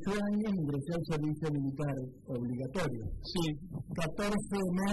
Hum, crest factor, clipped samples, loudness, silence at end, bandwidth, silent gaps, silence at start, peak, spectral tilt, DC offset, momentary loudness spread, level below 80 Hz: none; 14 dB; under 0.1%; -35 LUFS; 0 s; 12 kHz; none; 0 s; -20 dBFS; -6.5 dB/octave; under 0.1%; 7 LU; -52 dBFS